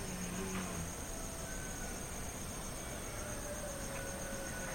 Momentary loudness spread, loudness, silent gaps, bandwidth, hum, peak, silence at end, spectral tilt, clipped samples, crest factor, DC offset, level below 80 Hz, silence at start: 3 LU; -42 LUFS; none; 16.5 kHz; none; -28 dBFS; 0 s; -3.5 dB/octave; under 0.1%; 14 dB; under 0.1%; -50 dBFS; 0 s